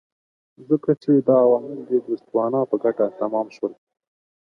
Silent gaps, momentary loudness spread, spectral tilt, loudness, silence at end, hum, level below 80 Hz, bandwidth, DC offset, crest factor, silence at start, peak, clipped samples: none; 9 LU; -10 dB/octave; -21 LUFS; 0.8 s; none; -76 dBFS; 6.4 kHz; under 0.1%; 18 dB; 0.6 s; -4 dBFS; under 0.1%